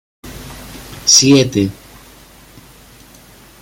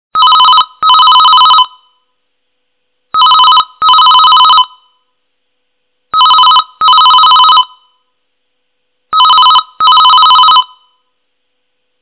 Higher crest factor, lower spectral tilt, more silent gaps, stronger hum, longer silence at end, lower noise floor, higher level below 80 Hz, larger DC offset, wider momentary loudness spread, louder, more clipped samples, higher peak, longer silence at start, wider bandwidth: first, 18 dB vs 8 dB; about the same, -3 dB/octave vs -2 dB/octave; neither; neither; first, 1.9 s vs 1.35 s; second, -42 dBFS vs -66 dBFS; first, -44 dBFS vs -58 dBFS; neither; first, 26 LU vs 6 LU; second, -11 LUFS vs -4 LUFS; neither; about the same, 0 dBFS vs 0 dBFS; about the same, 0.25 s vs 0.15 s; first, 17 kHz vs 4 kHz